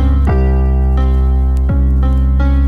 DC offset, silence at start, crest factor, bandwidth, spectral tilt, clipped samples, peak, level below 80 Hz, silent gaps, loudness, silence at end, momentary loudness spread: under 0.1%; 0 s; 8 dB; 3.5 kHz; -10 dB/octave; under 0.1%; -2 dBFS; -12 dBFS; none; -13 LUFS; 0 s; 1 LU